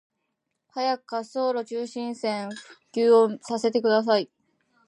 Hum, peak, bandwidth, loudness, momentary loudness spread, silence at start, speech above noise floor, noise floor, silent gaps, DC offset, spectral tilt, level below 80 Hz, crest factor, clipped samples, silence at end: none; -8 dBFS; 10.5 kHz; -25 LUFS; 15 LU; 0.75 s; 55 dB; -79 dBFS; none; under 0.1%; -4.5 dB/octave; -82 dBFS; 18 dB; under 0.1%; 0.6 s